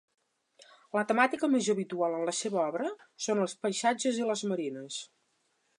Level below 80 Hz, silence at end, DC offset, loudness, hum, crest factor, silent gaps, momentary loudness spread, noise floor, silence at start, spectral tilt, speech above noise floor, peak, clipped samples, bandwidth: -86 dBFS; 0.75 s; under 0.1%; -31 LUFS; none; 22 dB; none; 11 LU; -75 dBFS; 0.95 s; -3.5 dB/octave; 44 dB; -10 dBFS; under 0.1%; 11.5 kHz